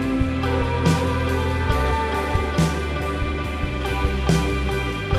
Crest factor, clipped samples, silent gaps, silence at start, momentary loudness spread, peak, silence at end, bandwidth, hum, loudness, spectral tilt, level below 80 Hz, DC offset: 16 dB; under 0.1%; none; 0 s; 5 LU; -6 dBFS; 0 s; 15 kHz; none; -22 LUFS; -6 dB/octave; -28 dBFS; under 0.1%